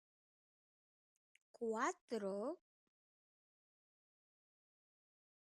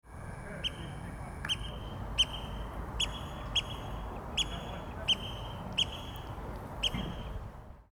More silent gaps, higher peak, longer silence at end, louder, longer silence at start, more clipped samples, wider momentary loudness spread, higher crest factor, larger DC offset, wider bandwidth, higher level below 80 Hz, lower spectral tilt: first, 2.01-2.08 s vs none; second, -26 dBFS vs -16 dBFS; first, 2.95 s vs 0.1 s; second, -44 LUFS vs -35 LUFS; first, 1.6 s vs 0.05 s; neither; second, 7 LU vs 13 LU; about the same, 24 dB vs 20 dB; neither; second, 11.5 kHz vs 19 kHz; second, under -90 dBFS vs -44 dBFS; first, -4.5 dB/octave vs -3 dB/octave